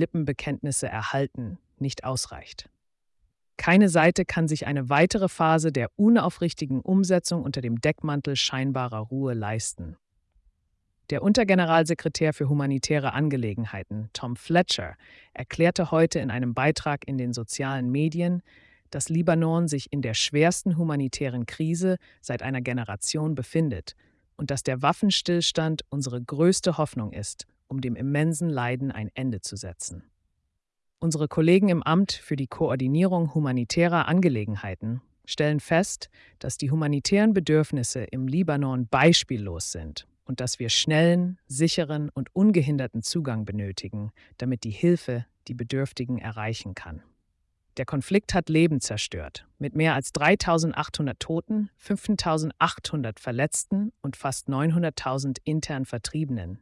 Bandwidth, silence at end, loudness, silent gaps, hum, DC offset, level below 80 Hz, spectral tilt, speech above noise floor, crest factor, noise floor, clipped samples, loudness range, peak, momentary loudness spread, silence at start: 12 kHz; 0.05 s; -25 LUFS; none; none; under 0.1%; -54 dBFS; -5 dB/octave; 54 dB; 18 dB; -79 dBFS; under 0.1%; 6 LU; -8 dBFS; 13 LU; 0 s